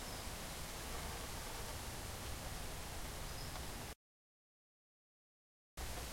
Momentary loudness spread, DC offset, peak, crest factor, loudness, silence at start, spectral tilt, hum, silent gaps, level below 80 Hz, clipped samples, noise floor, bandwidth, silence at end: 4 LU; under 0.1%; -32 dBFS; 16 dB; -47 LUFS; 0 s; -3 dB/octave; none; 3.95-5.77 s; -52 dBFS; under 0.1%; under -90 dBFS; 16.5 kHz; 0 s